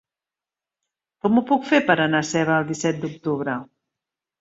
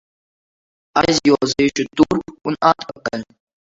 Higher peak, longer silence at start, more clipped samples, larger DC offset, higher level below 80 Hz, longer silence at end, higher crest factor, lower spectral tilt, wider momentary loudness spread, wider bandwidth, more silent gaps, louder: about the same, -2 dBFS vs 0 dBFS; first, 1.25 s vs 0.95 s; neither; neither; second, -64 dBFS vs -48 dBFS; first, 0.75 s vs 0.55 s; about the same, 20 dB vs 20 dB; about the same, -5 dB/octave vs -4.5 dB/octave; about the same, 9 LU vs 11 LU; about the same, 8 kHz vs 7.8 kHz; neither; second, -21 LUFS vs -18 LUFS